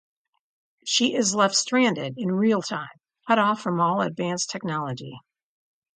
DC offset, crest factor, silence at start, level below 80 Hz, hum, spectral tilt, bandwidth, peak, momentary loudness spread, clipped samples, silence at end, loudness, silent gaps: under 0.1%; 20 dB; 0.85 s; -72 dBFS; none; -3.5 dB/octave; 9.6 kHz; -6 dBFS; 14 LU; under 0.1%; 0.75 s; -23 LUFS; none